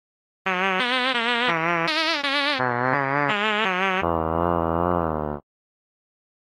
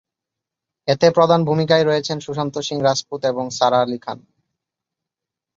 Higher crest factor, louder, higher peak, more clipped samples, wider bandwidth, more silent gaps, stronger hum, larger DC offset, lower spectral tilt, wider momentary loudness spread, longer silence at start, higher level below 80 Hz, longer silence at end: about the same, 16 dB vs 18 dB; second, -22 LUFS vs -18 LUFS; second, -8 dBFS vs -2 dBFS; neither; first, 16 kHz vs 7.8 kHz; neither; neither; neither; about the same, -5 dB/octave vs -5 dB/octave; second, 5 LU vs 11 LU; second, 0.45 s vs 0.85 s; first, -46 dBFS vs -62 dBFS; second, 1 s vs 1.4 s